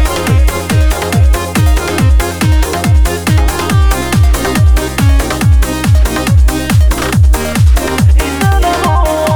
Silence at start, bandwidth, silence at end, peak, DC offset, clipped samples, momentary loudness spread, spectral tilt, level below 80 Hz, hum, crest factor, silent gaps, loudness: 0 s; over 20 kHz; 0 s; 0 dBFS; under 0.1%; under 0.1%; 1 LU; -5.5 dB/octave; -12 dBFS; none; 8 dB; none; -11 LUFS